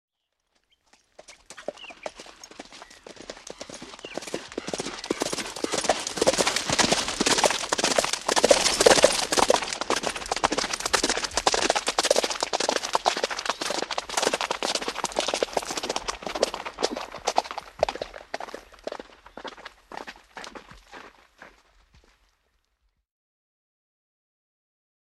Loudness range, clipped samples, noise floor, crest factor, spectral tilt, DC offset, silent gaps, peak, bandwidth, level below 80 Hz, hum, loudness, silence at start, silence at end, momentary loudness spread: 21 LU; under 0.1%; -75 dBFS; 26 dB; -1 dB/octave; under 0.1%; none; -2 dBFS; 15.5 kHz; -54 dBFS; none; -24 LUFS; 1.3 s; 3.65 s; 21 LU